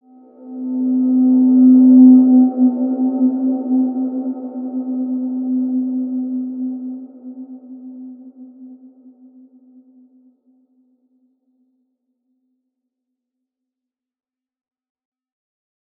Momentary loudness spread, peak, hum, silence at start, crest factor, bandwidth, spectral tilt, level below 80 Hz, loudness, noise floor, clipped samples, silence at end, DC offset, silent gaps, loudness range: 27 LU; -2 dBFS; none; 0.4 s; 16 dB; 1.4 kHz; -14 dB/octave; -84 dBFS; -15 LUFS; -86 dBFS; under 0.1%; 7.25 s; under 0.1%; none; 20 LU